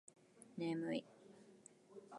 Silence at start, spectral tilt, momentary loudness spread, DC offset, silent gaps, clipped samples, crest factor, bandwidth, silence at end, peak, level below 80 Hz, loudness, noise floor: 0.35 s; -6 dB/octave; 21 LU; under 0.1%; none; under 0.1%; 18 dB; 11 kHz; 0 s; -30 dBFS; under -90 dBFS; -45 LUFS; -65 dBFS